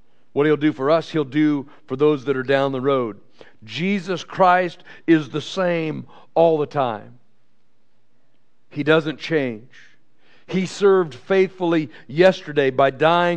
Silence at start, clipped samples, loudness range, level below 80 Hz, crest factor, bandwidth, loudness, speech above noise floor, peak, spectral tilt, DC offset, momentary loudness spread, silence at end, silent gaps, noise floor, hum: 0.35 s; under 0.1%; 5 LU; -68 dBFS; 18 dB; 9 kHz; -20 LUFS; 49 dB; -2 dBFS; -6.5 dB/octave; 0.6%; 11 LU; 0 s; none; -68 dBFS; none